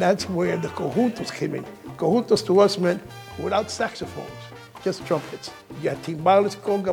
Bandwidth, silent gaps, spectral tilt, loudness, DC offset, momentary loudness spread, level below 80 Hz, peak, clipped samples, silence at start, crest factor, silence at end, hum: 18.5 kHz; none; -5.5 dB/octave; -23 LUFS; under 0.1%; 18 LU; -58 dBFS; -4 dBFS; under 0.1%; 0 s; 18 dB; 0 s; none